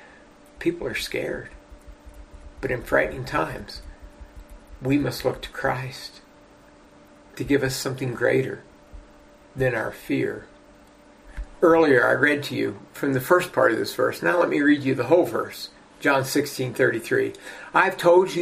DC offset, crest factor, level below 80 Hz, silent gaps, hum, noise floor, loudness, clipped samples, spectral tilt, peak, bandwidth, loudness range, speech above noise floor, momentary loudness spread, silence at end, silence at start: under 0.1%; 20 dB; -48 dBFS; none; none; -51 dBFS; -23 LUFS; under 0.1%; -5.5 dB/octave; -4 dBFS; 15.5 kHz; 8 LU; 29 dB; 18 LU; 0 s; 0.6 s